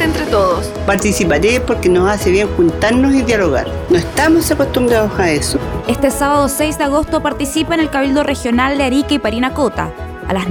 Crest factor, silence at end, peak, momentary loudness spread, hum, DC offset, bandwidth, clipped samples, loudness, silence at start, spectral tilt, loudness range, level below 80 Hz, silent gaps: 14 dB; 0 s; 0 dBFS; 5 LU; none; under 0.1%; 19.5 kHz; under 0.1%; -14 LUFS; 0 s; -5 dB/octave; 2 LU; -28 dBFS; none